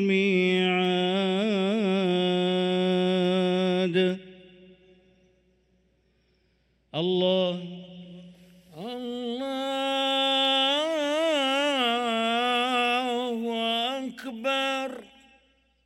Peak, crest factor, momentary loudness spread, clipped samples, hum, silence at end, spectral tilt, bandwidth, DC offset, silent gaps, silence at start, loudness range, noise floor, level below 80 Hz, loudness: -12 dBFS; 14 dB; 13 LU; under 0.1%; none; 0.8 s; -5.5 dB/octave; 13.5 kHz; under 0.1%; none; 0 s; 7 LU; -68 dBFS; -70 dBFS; -25 LUFS